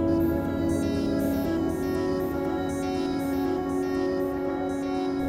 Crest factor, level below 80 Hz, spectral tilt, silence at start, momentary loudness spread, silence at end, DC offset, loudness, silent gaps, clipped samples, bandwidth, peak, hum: 12 dB; -46 dBFS; -7 dB/octave; 0 s; 3 LU; 0 s; under 0.1%; -27 LUFS; none; under 0.1%; 16 kHz; -14 dBFS; none